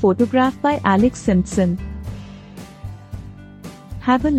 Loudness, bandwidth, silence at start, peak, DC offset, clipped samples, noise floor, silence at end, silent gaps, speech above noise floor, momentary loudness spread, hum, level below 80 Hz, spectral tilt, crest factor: -18 LUFS; 12 kHz; 0 s; -2 dBFS; under 0.1%; under 0.1%; -38 dBFS; 0 s; none; 21 dB; 21 LU; none; -36 dBFS; -6.5 dB/octave; 18 dB